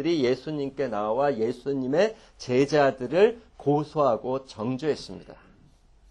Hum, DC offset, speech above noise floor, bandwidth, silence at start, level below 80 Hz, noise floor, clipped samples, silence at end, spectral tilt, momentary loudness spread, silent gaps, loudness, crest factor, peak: none; under 0.1%; 31 dB; 10 kHz; 0 s; -58 dBFS; -57 dBFS; under 0.1%; 0.75 s; -6.5 dB/octave; 10 LU; none; -26 LUFS; 18 dB; -8 dBFS